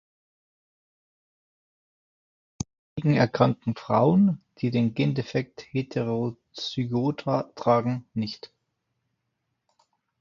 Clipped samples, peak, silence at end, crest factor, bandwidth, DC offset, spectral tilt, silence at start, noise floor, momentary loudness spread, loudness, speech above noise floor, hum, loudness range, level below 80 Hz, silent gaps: under 0.1%; -4 dBFS; 1.75 s; 24 dB; 7.4 kHz; under 0.1%; -7.5 dB/octave; 2.6 s; -79 dBFS; 13 LU; -26 LUFS; 54 dB; none; 5 LU; -62 dBFS; 2.79-2.96 s